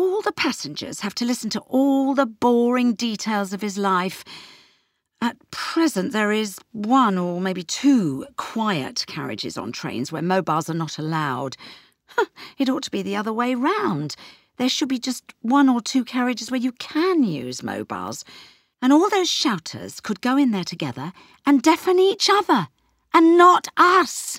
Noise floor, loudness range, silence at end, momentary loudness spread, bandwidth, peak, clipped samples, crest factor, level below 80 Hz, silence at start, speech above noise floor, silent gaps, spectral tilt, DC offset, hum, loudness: -66 dBFS; 6 LU; 0 s; 13 LU; 16 kHz; -2 dBFS; under 0.1%; 20 dB; -68 dBFS; 0 s; 45 dB; none; -4.5 dB/octave; under 0.1%; none; -21 LUFS